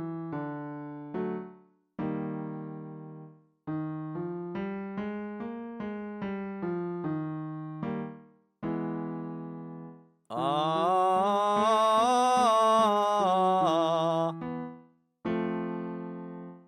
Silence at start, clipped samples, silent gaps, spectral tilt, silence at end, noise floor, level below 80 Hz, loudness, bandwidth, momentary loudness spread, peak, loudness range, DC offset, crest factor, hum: 0 s; under 0.1%; none; -5.5 dB/octave; 0.1 s; -57 dBFS; -70 dBFS; -30 LUFS; 13.5 kHz; 18 LU; -12 dBFS; 13 LU; under 0.1%; 18 dB; none